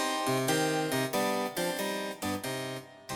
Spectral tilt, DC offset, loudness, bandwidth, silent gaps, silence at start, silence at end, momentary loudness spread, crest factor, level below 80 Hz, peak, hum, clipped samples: -3.5 dB/octave; under 0.1%; -31 LUFS; over 20 kHz; none; 0 s; 0 s; 8 LU; 14 dB; -70 dBFS; -16 dBFS; none; under 0.1%